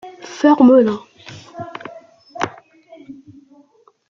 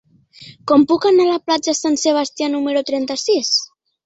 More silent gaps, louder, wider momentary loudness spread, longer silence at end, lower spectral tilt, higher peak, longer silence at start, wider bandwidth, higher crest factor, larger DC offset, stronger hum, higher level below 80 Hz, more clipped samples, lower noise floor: neither; about the same, -14 LUFS vs -16 LUFS; first, 27 LU vs 7 LU; first, 0.95 s vs 0.4 s; first, -6 dB/octave vs -2.5 dB/octave; about the same, -2 dBFS vs -2 dBFS; second, 0.05 s vs 0.4 s; second, 7.4 kHz vs 8.2 kHz; about the same, 18 dB vs 16 dB; neither; neither; about the same, -62 dBFS vs -62 dBFS; neither; first, -53 dBFS vs -43 dBFS